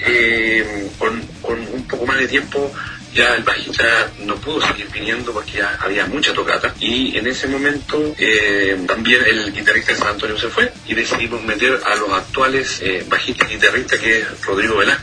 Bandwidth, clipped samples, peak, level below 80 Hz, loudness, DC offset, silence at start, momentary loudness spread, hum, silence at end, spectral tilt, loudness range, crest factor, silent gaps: 10.5 kHz; under 0.1%; 0 dBFS; -42 dBFS; -16 LUFS; under 0.1%; 0 s; 9 LU; none; 0 s; -3 dB/octave; 3 LU; 18 dB; none